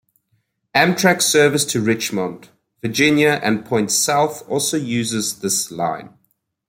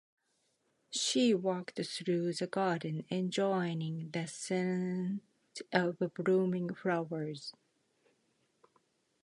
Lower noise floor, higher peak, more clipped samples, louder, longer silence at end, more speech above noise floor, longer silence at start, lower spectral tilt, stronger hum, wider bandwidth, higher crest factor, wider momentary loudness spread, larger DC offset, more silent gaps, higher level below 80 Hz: second, -67 dBFS vs -78 dBFS; first, 0 dBFS vs -14 dBFS; neither; first, -17 LUFS vs -34 LUFS; second, 0.6 s vs 1.75 s; first, 49 dB vs 44 dB; second, 0.75 s vs 0.9 s; second, -3.5 dB/octave vs -5 dB/octave; neither; first, 16.5 kHz vs 11.5 kHz; about the same, 18 dB vs 22 dB; about the same, 10 LU vs 9 LU; neither; neither; first, -60 dBFS vs -82 dBFS